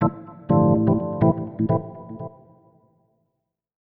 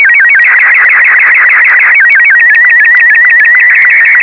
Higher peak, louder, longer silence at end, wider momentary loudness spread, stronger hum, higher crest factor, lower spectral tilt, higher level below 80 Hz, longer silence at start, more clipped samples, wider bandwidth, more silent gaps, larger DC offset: second, -6 dBFS vs 0 dBFS; second, -21 LUFS vs -1 LUFS; first, 1.55 s vs 0 s; first, 19 LU vs 1 LU; neither; first, 18 dB vs 4 dB; first, -14 dB/octave vs -1.5 dB/octave; first, -50 dBFS vs -64 dBFS; about the same, 0 s vs 0 s; second, under 0.1% vs 1%; second, 3.4 kHz vs 5.4 kHz; neither; second, under 0.1% vs 0.3%